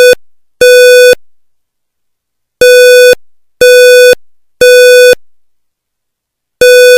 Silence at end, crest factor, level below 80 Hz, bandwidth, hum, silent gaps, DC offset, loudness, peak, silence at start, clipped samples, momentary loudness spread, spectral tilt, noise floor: 0 s; 4 dB; -44 dBFS; 16.5 kHz; none; none; under 0.1%; -3 LUFS; 0 dBFS; 0 s; 5%; 11 LU; 0 dB/octave; -71 dBFS